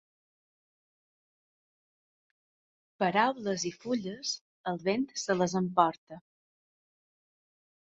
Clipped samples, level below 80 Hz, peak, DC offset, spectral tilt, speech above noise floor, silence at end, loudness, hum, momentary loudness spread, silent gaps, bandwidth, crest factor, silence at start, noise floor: under 0.1%; -76 dBFS; -8 dBFS; under 0.1%; -4.5 dB/octave; over 60 dB; 1.65 s; -31 LUFS; none; 9 LU; 4.41-4.64 s, 5.98-6.07 s; 8 kHz; 26 dB; 3 s; under -90 dBFS